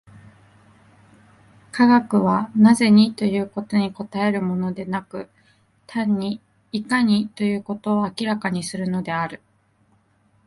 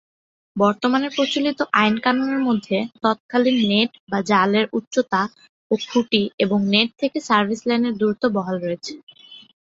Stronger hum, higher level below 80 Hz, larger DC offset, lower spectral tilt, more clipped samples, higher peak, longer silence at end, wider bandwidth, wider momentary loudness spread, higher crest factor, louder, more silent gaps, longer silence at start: neither; about the same, -62 dBFS vs -62 dBFS; neither; about the same, -6 dB/octave vs -5 dB/octave; neither; about the same, -4 dBFS vs -2 dBFS; first, 1.1 s vs 0.25 s; first, 11.5 kHz vs 7.8 kHz; first, 15 LU vs 8 LU; about the same, 18 dB vs 20 dB; about the same, -21 LUFS vs -20 LUFS; second, none vs 3.20-3.29 s, 4.00-4.07 s, 4.87-4.91 s, 5.49-5.70 s, 6.34-6.38 s, 9.03-9.07 s; first, 1.75 s vs 0.55 s